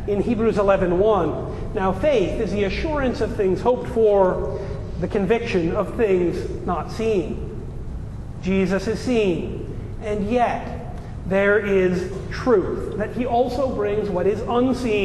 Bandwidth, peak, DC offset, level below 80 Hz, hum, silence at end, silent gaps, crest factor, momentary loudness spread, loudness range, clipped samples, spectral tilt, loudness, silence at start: 12 kHz; -4 dBFS; under 0.1%; -34 dBFS; none; 0 s; none; 16 dB; 12 LU; 3 LU; under 0.1%; -7 dB/octave; -21 LUFS; 0 s